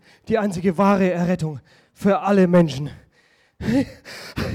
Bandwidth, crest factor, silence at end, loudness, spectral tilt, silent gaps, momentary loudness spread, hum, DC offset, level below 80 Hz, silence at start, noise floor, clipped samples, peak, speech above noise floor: 14 kHz; 14 dB; 0 s; -20 LUFS; -7.5 dB/octave; none; 15 LU; none; under 0.1%; -48 dBFS; 0.3 s; -59 dBFS; under 0.1%; -6 dBFS; 39 dB